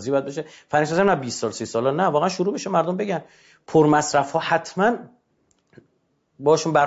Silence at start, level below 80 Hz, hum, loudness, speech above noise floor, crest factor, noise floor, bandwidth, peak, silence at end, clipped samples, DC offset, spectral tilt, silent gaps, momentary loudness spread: 0 s; -62 dBFS; none; -21 LUFS; 47 dB; 16 dB; -68 dBFS; 8 kHz; -6 dBFS; 0 s; under 0.1%; under 0.1%; -5 dB/octave; none; 9 LU